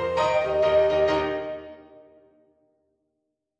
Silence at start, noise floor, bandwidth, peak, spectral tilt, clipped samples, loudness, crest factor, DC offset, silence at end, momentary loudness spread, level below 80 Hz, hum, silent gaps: 0 s; -79 dBFS; 8.4 kHz; -12 dBFS; -5.5 dB/octave; under 0.1%; -23 LUFS; 14 dB; under 0.1%; 1.8 s; 16 LU; -52 dBFS; none; none